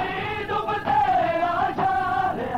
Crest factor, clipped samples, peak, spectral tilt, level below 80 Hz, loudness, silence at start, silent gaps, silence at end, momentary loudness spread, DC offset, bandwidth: 10 dB; under 0.1%; -12 dBFS; -6 dB/octave; -48 dBFS; -23 LUFS; 0 s; none; 0 s; 6 LU; 0.3%; 13 kHz